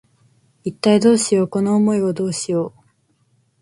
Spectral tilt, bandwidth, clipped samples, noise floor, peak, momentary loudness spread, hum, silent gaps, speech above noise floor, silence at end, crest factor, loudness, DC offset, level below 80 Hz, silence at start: -5.5 dB/octave; 11.5 kHz; under 0.1%; -62 dBFS; -2 dBFS; 14 LU; none; none; 45 dB; 0.95 s; 16 dB; -17 LUFS; under 0.1%; -62 dBFS; 0.65 s